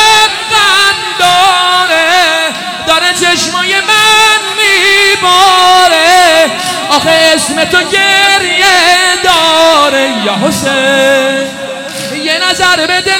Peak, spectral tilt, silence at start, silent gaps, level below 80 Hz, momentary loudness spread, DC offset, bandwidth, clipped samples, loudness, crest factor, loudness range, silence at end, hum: 0 dBFS; -1 dB/octave; 0 s; none; -44 dBFS; 7 LU; under 0.1%; 19.5 kHz; 0.4%; -6 LUFS; 8 dB; 3 LU; 0 s; none